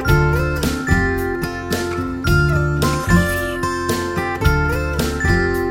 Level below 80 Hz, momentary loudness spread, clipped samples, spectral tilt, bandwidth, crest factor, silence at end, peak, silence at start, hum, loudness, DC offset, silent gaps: -26 dBFS; 6 LU; under 0.1%; -6 dB/octave; 17 kHz; 16 dB; 0 s; -2 dBFS; 0 s; none; -18 LUFS; under 0.1%; none